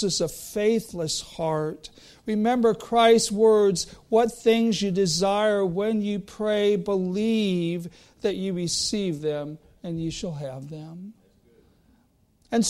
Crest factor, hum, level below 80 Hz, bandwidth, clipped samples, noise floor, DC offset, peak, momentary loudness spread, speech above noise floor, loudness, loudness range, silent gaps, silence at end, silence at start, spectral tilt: 18 dB; none; -56 dBFS; 15 kHz; under 0.1%; -63 dBFS; under 0.1%; -8 dBFS; 17 LU; 39 dB; -24 LUFS; 9 LU; none; 0 s; 0 s; -4.5 dB/octave